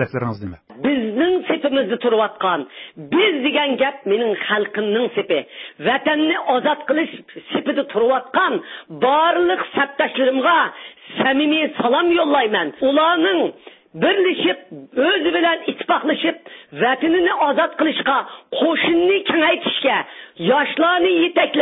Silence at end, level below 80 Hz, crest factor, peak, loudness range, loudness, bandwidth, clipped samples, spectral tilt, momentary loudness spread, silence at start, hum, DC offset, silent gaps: 0 s; -60 dBFS; 16 dB; -4 dBFS; 2 LU; -18 LUFS; 5.2 kHz; under 0.1%; -9.5 dB/octave; 9 LU; 0 s; none; under 0.1%; none